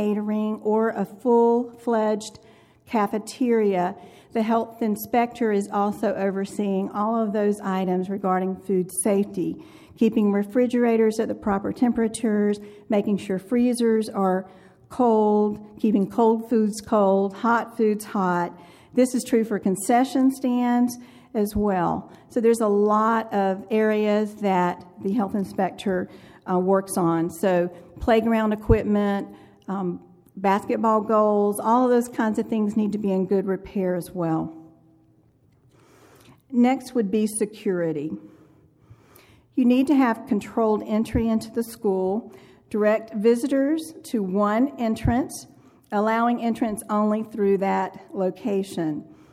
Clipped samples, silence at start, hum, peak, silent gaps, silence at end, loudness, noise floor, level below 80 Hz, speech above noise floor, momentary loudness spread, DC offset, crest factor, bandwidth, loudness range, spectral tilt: under 0.1%; 0 s; none; -4 dBFS; none; 0.2 s; -23 LUFS; -59 dBFS; -48 dBFS; 37 dB; 9 LU; under 0.1%; 18 dB; 15.5 kHz; 4 LU; -6.5 dB/octave